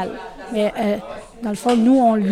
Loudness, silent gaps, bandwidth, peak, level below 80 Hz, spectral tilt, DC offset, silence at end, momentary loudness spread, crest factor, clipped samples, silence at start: -19 LUFS; none; 14 kHz; -6 dBFS; -50 dBFS; -6.5 dB/octave; under 0.1%; 0 s; 15 LU; 14 dB; under 0.1%; 0 s